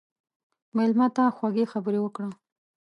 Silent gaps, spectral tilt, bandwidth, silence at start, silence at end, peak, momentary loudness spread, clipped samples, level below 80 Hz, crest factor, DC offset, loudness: none; -8 dB/octave; 8.6 kHz; 0.75 s; 0.5 s; -10 dBFS; 10 LU; under 0.1%; -82 dBFS; 16 dB; under 0.1%; -25 LUFS